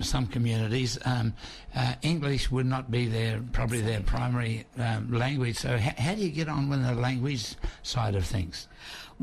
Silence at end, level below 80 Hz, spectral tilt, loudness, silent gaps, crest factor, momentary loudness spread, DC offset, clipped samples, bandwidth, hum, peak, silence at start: 0.1 s; -40 dBFS; -5.5 dB/octave; -29 LUFS; none; 12 dB; 6 LU; under 0.1%; under 0.1%; 13.5 kHz; none; -16 dBFS; 0 s